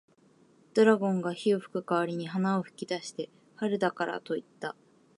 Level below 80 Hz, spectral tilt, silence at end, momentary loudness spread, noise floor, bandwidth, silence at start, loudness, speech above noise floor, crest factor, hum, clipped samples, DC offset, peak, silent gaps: -82 dBFS; -6 dB/octave; 0.45 s; 16 LU; -62 dBFS; 11.5 kHz; 0.75 s; -30 LUFS; 33 dB; 22 dB; none; under 0.1%; under 0.1%; -8 dBFS; none